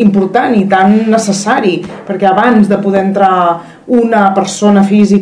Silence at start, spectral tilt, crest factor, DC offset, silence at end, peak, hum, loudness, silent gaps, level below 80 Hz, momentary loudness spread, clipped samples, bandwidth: 0 s; -6 dB/octave; 8 dB; under 0.1%; 0 s; 0 dBFS; none; -9 LUFS; none; -50 dBFS; 6 LU; 2%; 11 kHz